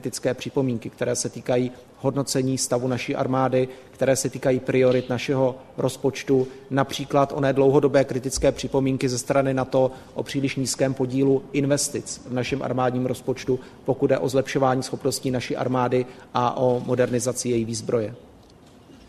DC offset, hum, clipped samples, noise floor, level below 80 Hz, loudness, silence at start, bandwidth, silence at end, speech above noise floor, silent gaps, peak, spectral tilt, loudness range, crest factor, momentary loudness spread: under 0.1%; none; under 0.1%; -50 dBFS; -52 dBFS; -23 LUFS; 0 s; 13.5 kHz; 0.1 s; 27 dB; none; -4 dBFS; -5 dB/octave; 3 LU; 18 dB; 6 LU